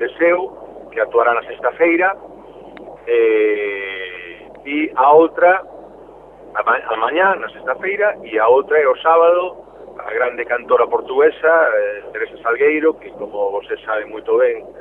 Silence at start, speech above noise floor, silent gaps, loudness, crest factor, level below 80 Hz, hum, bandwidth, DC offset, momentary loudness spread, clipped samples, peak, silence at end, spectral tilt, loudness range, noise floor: 0 s; 24 dB; none; -16 LUFS; 16 dB; -56 dBFS; none; 3.9 kHz; under 0.1%; 16 LU; under 0.1%; -2 dBFS; 0 s; -7 dB/octave; 3 LU; -40 dBFS